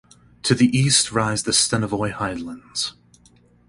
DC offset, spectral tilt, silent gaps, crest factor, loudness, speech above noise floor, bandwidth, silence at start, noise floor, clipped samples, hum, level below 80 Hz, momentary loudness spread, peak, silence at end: under 0.1%; -3.5 dB/octave; none; 20 dB; -20 LUFS; 34 dB; 11.5 kHz; 0.45 s; -55 dBFS; under 0.1%; none; -50 dBFS; 11 LU; -2 dBFS; 0.8 s